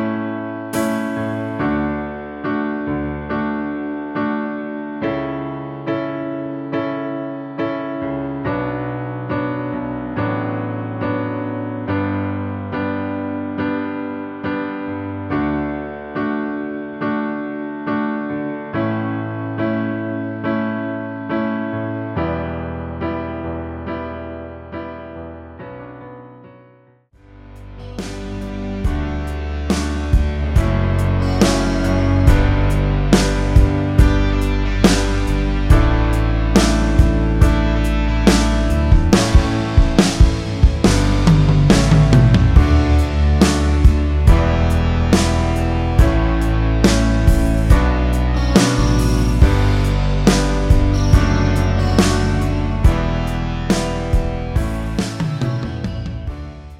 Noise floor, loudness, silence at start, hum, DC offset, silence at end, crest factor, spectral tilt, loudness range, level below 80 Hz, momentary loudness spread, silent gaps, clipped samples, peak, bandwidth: -51 dBFS; -18 LUFS; 0 s; none; under 0.1%; 0.05 s; 16 dB; -6.5 dB/octave; 11 LU; -20 dBFS; 12 LU; none; under 0.1%; 0 dBFS; 14 kHz